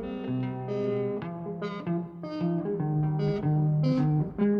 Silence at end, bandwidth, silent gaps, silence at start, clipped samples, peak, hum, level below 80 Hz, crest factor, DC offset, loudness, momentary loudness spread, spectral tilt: 0 s; 5.4 kHz; none; 0 s; under 0.1%; -16 dBFS; none; -56 dBFS; 12 dB; under 0.1%; -29 LUFS; 9 LU; -10 dB/octave